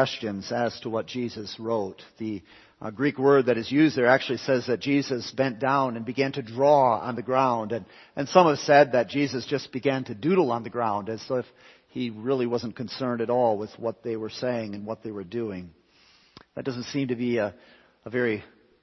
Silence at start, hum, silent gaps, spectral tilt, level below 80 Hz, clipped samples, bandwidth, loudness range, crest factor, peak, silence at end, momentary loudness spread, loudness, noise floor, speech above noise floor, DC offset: 0 s; none; none; -6 dB/octave; -68 dBFS; under 0.1%; 6.2 kHz; 9 LU; 24 dB; -2 dBFS; 0.4 s; 15 LU; -26 LUFS; -59 dBFS; 34 dB; under 0.1%